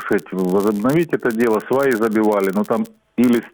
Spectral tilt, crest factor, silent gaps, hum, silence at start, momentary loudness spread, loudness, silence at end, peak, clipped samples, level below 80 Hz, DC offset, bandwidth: -7 dB/octave; 14 dB; none; none; 0 s; 5 LU; -18 LUFS; 0.05 s; -4 dBFS; under 0.1%; -58 dBFS; under 0.1%; over 20 kHz